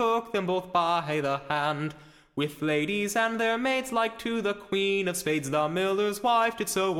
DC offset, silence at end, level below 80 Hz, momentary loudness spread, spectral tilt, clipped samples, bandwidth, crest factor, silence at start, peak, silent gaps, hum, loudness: under 0.1%; 0 s; -62 dBFS; 5 LU; -4 dB/octave; under 0.1%; 17 kHz; 16 dB; 0 s; -12 dBFS; none; none; -27 LUFS